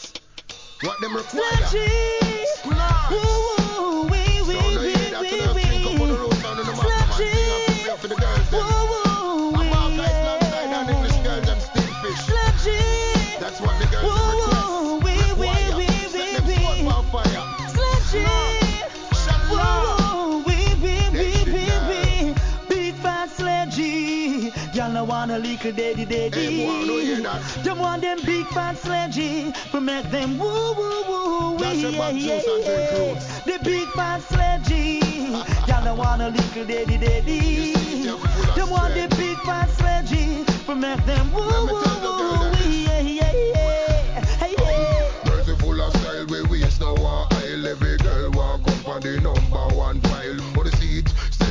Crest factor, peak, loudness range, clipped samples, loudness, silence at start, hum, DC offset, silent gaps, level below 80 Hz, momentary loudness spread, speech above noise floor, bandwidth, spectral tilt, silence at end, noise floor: 16 dB; -4 dBFS; 3 LU; under 0.1%; -22 LUFS; 0 s; none; 0.2%; none; -24 dBFS; 5 LU; 19 dB; 7.6 kHz; -5.5 dB/octave; 0 s; -40 dBFS